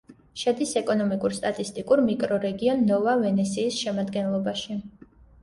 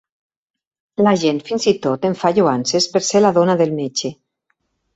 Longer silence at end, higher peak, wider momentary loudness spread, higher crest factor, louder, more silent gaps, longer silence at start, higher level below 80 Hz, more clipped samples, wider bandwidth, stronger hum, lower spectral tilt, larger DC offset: second, 0.55 s vs 0.85 s; second, -10 dBFS vs -2 dBFS; about the same, 8 LU vs 8 LU; about the same, 16 dB vs 16 dB; second, -25 LUFS vs -17 LUFS; neither; second, 0.1 s vs 1 s; about the same, -60 dBFS vs -60 dBFS; neither; first, 11.5 kHz vs 8.2 kHz; neither; about the same, -5.5 dB/octave vs -4.5 dB/octave; neither